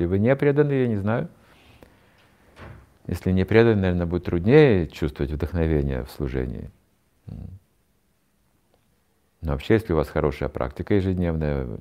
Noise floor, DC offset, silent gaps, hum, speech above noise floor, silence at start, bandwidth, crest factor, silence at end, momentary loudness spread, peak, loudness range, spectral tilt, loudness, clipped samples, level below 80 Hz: -67 dBFS; under 0.1%; none; none; 45 dB; 0 s; 15 kHz; 22 dB; 0.05 s; 19 LU; -2 dBFS; 13 LU; -8.5 dB/octave; -22 LUFS; under 0.1%; -40 dBFS